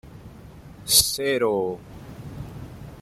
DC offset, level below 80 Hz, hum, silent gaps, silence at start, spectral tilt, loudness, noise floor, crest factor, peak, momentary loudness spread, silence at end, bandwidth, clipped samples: under 0.1%; -48 dBFS; none; none; 0.05 s; -2 dB/octave; -20 LUFS; -44 dBFS; 24 dB; -2 dBFS; 23 LU; 0 s; 16 kHz; under 0.1%